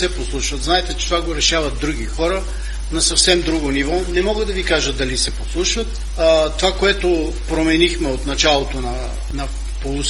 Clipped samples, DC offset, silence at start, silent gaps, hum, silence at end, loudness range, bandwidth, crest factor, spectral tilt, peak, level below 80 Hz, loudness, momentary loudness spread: under 0.1%; under 0.1%; 0 s; none; none; 0 s; 1 LU; 11.5 kHz; 18 dB; -3 dB/octave; 0 dBFS; -24 dBFS; -18 LUFS; 11 LU